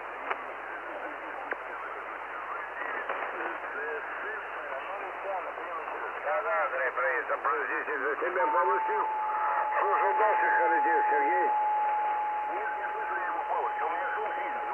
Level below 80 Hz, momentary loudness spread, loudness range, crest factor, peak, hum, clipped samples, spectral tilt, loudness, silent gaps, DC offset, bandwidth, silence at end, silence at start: -70 dBFS; 11 LU; 9 LU; 18 dB; -12 dBFS; none; under 0.1%; -4.5 dB/octave; -30 LUFS; none; under 0.1%; 3.3 kHz; 0 s; 0 s